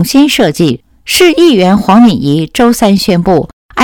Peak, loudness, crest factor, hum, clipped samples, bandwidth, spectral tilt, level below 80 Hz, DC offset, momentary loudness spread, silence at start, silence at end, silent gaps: 0 dBFS; -8 LUFS; 8 dB; none; 2%; 19.5 kHz; -5 dB/octave; -36 dBFS; 0.5%; 7 LU; 0 s; 0 s; 3.53-3.69 s